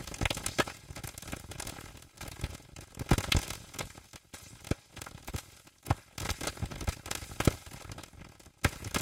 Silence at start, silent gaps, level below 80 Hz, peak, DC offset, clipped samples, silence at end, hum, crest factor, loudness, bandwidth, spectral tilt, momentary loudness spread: 0 s; none; -44 dBFS; -8 dBFS; under 0.1%; under 0.1%; 0 s; none; 28 dB; -36 LUFS; 17 kHz; -4 dB/octave; 18 LU